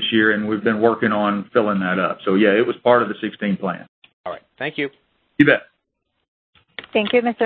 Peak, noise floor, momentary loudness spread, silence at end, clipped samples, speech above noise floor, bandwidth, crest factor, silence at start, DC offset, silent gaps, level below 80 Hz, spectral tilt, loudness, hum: 0 dBFS; -74 dBFS; 18 LU; 0 s; under 0.1%; 56 dB; 4.5 kHz; 20 dB; 0 s; under 0.1%; 3.88-4.02 s, 4.13-4.24 s, 6.28-6.53 s; -60 dBFS; -9 dB/octave; -19 LUFS; none